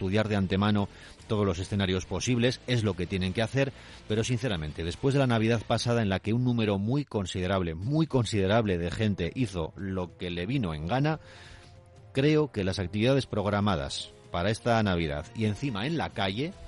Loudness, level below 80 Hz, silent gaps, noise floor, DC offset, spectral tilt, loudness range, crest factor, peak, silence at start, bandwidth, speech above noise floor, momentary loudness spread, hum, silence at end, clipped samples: -29 LUFS; -52 dBFS; none; -52 dBFS; under 0.1%; -6 dB/octave; 3 LU; 16 dB; -12 dBFS; 0 s; 11.5 kHz; 24 dB; 9 LU; none; 0 s; under 0.1%